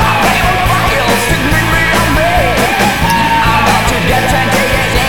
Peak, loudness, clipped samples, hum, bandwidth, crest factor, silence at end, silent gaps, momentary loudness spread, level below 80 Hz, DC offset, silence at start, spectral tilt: 0 dBFS; -10 LUFS; under 0.1%; none; over 20 kHz; 10 dB; 0 s; none; 1 LU; -22 dBFS; 5%; 0 s; -4 dB/octave